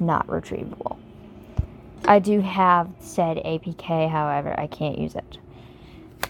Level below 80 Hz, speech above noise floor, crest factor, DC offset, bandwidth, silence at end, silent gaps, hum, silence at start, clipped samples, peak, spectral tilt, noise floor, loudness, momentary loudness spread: -46 dBFS; 22 dB; 22 dB; under 0.1%; 18 kHz; 0 s; none; none; 0 s; under 0.1%; -2 dBFS; -6.5 dB/octave; -45 dBFS; -23 LUFS; 16 LU